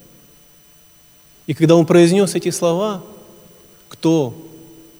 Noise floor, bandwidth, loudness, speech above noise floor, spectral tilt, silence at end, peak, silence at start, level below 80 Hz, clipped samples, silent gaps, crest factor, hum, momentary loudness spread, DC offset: -49 dBFS; over 20 kHz; -16 LUFS; 34 dB; -6 dB/octave; 0.55 s; 0 dBFS; 1.5 s; -62 dBFS; under 0.1%; none; 18 dB; none; 18 LU; under 0.1%